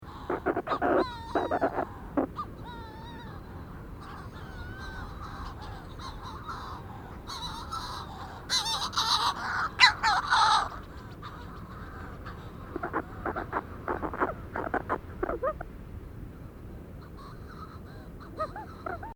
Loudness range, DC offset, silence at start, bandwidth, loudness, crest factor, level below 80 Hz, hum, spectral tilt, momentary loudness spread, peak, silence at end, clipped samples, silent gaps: 16 LU; under 0.1%; 0 s; over 20 kHz; -30 LUFS; 28 dB; -48 dBFS; none; -3.5 dB/octave; 19 LU; -4 dBFS; 0 s; under 0.1%; none